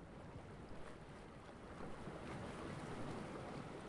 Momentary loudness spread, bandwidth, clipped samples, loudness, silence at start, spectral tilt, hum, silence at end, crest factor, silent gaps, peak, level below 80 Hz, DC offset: 7 LU; 11.5 kHz; under 0.1%; -52 LUFS; 0 s; -6 dB/octave; none; 0 s; 14 dB; none; -36 dBFS; -64 dBFS; under 0.1%